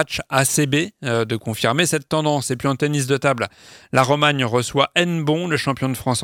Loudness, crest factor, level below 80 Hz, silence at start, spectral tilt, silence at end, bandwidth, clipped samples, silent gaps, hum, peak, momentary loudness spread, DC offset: -19 LUFS; 18 dB; -54 dBFS; 0 s; -4 dB/octave; 0 s; 17 kHz; under 0.1%; none; none; 0 dBFS; 5 LU; under 0.1%